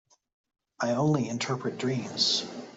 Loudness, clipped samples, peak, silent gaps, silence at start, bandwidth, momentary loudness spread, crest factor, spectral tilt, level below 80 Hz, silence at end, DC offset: -28 LUFS; under 0.1%; -10 dBFS; none; 0.8 s; 8 kHz; 6 LU; 20 dB; -4.5 dB/octave; -70 dBFS; 0 s; under 0.1%